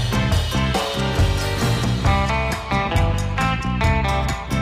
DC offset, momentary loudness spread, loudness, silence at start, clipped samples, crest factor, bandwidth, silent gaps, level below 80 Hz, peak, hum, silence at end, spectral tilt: under 0.1%; 3 LU; -20 LUFS; 0 s; under 0.1%; 12 dB; 16 kHz; none; -26 dBFS; -8 dBFS; none; 0 s; -5.5 dB/octave